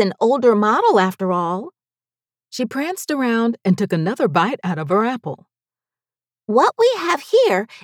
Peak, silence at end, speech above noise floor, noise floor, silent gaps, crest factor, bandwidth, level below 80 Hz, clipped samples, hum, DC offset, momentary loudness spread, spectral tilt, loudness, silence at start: -4 dBFS; 0.05 s; over 72 dB; under -90 dBFS; none; 16 dB; 17 kHz; -80 dBFS; under 0.1%; none; under 0.1%; 13 LU; -6 dB/octave; -18 LUFS; 0 s